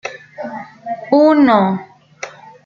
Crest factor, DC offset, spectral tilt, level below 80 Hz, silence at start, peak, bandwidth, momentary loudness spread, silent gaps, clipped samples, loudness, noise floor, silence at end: 16 dB; under 0.1%; -7 dB/octave; -62 dBFS; 0.05 s; 0 dBFS; 7 kHz; 21 LU; none; under 0.1%; -13 LUFS; -34 dBFS; 0.35 s